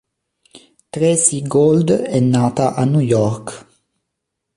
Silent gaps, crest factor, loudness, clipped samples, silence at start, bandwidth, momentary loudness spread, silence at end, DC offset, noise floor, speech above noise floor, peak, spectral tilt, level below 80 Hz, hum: none; 18 dB; -15 LUFS; under 0.1%; 0.55 s; 11.5 kHz; 9 LU; 0.95 s; under 0.1%; -77 dBFS; 62 dB; 0 dBFS; -6 dB/octave; -52 dBFS; none